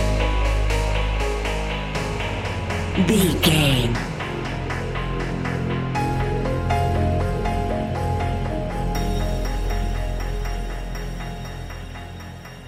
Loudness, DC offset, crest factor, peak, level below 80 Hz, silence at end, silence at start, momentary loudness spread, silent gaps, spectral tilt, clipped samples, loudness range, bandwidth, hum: -24 LUFS; under 0.1%; 20 dB; -2 dBFS; -28 dBFS; 0 s; 0 s; 13 LU; none; -5.5 dB/octave; under 0.1%; 6 LU; 16 kHz; none